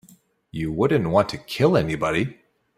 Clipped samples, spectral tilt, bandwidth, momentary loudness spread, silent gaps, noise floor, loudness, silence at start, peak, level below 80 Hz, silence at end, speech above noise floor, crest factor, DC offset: under 0.1%; -6.5 dB/octave; 15.5 kHz; 11 LU; none; -55 dBFS; -22 LUFS; 0.55 s; -4 dBFS; -50 dBFS; 0.45 s; 34 dB; 20 dB; under 0.1%